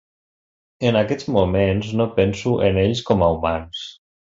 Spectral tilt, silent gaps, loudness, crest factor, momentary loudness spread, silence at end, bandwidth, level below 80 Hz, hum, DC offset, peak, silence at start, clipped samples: -7 dB/octave; none; -20 LUFS; 18 dB; 8 LU; 0.3 s; 7.8 kHz; -38 dBFS; none; under 0.1%; -2 dBFS; 0.8 s; under 0.1%